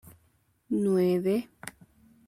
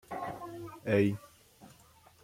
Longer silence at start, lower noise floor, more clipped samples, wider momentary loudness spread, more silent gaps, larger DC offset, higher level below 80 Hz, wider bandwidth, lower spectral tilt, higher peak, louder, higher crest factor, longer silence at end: first, 0.7 s vs 0.1 s; first, -68 dBFS vs -61 dBFS; neither; first, 20 LU vs 15 LU; neither; neither; about the same, -68 dBFS vs -68 dBFS; about the same, 15.5 kHz vs 16.5 kHz; about the same, -7.5 dB/octave vs -7.5 dB/octave; about the same, -16 dBFS vs -16 dBFS; first, -27 LUFS vs -34 LUFS; second, 14 dB vs 20 dB; about the same, 0.6 s vs 0.55 s